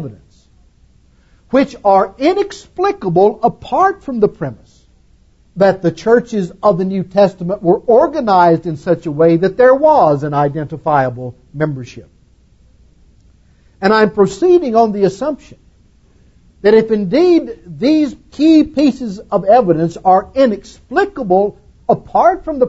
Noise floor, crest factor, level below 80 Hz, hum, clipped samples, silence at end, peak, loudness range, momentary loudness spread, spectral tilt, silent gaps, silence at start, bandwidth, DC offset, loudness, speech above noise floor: -49 dBFS; 14 dB; -46 dBFS; none; under 0.1%; 0 s; 0 dBFS; 5 LU; 10 LU; -7.5 dB/octave; none; 0 s; 8 kHz; under 0.1%; -13 LUFS; 37 dB